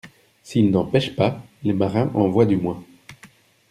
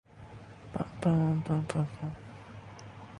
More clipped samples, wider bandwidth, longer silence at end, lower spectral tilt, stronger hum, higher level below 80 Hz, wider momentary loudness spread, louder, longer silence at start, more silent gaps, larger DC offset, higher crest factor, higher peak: neither; first, 13 kHz vs 11 kHz; first, 0.45 s vs 0 s; about the same, -7.5 dB/octave vs -8 dB/octave; neither; about the same, -54 dBFS vs -58 dBFS; second, 9 LU vs 21 LU; first, -21 LUFS vs -32 LUFS; about the same, 0.05 s vs 0.15 s; neither; neither; about the same, 18 dB vs 20 dB; first, -2 dBFS vs -14 dBFS